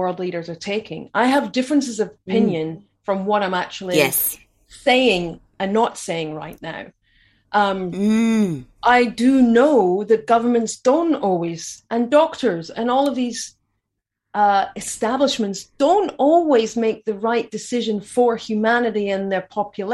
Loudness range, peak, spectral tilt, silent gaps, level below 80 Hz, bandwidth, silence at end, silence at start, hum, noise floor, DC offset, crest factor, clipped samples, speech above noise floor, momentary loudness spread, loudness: 5 LU; -2 dBFS; -4.5 dB/octave; none; -58 dBFS; 16 kHz; 0 s; 0 s; none; -80 dBFS; under 0.1%; 18 dB; under 0.1%; 61 dB; 11 LU; -19 LUFS